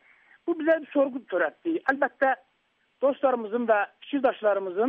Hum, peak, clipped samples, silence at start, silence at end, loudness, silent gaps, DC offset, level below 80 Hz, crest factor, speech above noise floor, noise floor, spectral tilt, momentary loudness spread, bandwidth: none; -10 dBFS; under 0.1%; 0.45 s; 0 s; -26 LUFS; none; under 0.1%; -74 dBFS; 16 dB; 45 dB; -70 dBFS; -2.5 dB/octave; 4 LU; 5 kHz